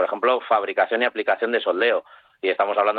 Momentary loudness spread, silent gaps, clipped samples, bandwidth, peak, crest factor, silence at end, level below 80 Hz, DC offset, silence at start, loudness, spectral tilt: 4 LU; none; under 0.1%; 4.8 kHz; -6 dBFS; 14 dB; 0 s; -72 dBFS; under 0.1%; 0 s; -22 LUFS; -6 dB/octave